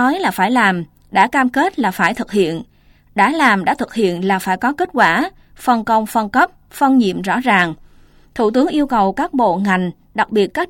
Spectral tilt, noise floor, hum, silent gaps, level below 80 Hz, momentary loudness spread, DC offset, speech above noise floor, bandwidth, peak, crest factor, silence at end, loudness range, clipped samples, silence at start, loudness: -5.5 dB/octave; -46 dBFS; none; none; -48 dBFS; 7 LU; under 0.1%; 31 dB; 17 kHz; -2 dBFS; 14 dB; 0 s; 1 LU; under 0.1%; 0 s; -16 LUFS